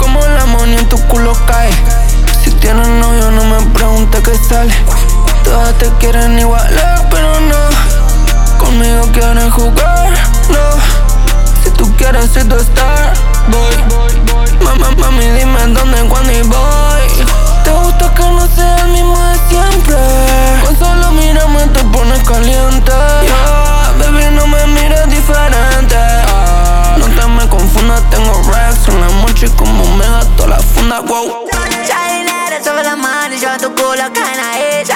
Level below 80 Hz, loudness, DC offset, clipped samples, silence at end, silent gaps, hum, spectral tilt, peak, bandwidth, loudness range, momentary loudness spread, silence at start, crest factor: -6 dBFS; -10 LUFS; under 0.1%; under 0.1%; 0 s; none; none; -4.5 dB/octave; 0 dBFS; 16.5 kHz; 1 LU; 3 LU; 0 s; 6 dB